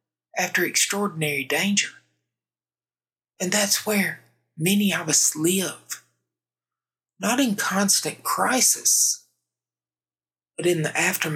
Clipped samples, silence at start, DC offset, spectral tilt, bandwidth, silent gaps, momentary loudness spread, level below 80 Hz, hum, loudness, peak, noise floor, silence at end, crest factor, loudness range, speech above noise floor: under 0.1%; 0.35 s; under 0.1%; -2.5 dB/octave; 18 kHz; none; 13 LU; -86 dBFS; none; -21 LUFS; -4 dBFS; under -90 dBFS; 0 s; 20 dB; 4 LU; over 67 dB